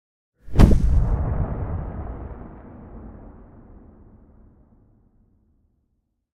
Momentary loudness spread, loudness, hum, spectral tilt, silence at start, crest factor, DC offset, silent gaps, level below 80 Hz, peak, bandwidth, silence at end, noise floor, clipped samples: 26 LU; -22 LUFS; none; -8.5 dB/octave; 0.45 s; 24 dB; under 0.1%; none; -26 dBFS; 0 dBFS; 11.5 kHz; 3.1 s; -72 dBFS; under 0.1%